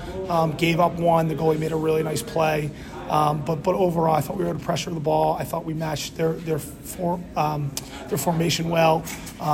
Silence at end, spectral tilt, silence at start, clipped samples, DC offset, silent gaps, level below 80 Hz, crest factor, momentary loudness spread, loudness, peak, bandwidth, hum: 0 s; -5.5 dB/octave; 0 s; under 0.1%; under 0.1%; none; -46 dBFS; 16 dB; 9 LU; -23 LUFS; -6 dBFS; 16.5 kHz; none